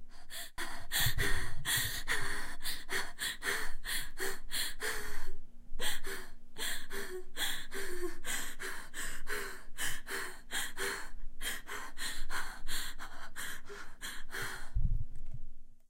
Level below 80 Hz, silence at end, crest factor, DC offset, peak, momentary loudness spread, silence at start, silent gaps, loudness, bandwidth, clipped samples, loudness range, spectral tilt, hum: -40 dBFS; 0.1 s; 16 dB; under 0.1%; -16 dBFS; 12 LU; 0 s; none; -38 LUFS; 16 kHz; under 0.1%; 7 LU; -2 dB/octave; none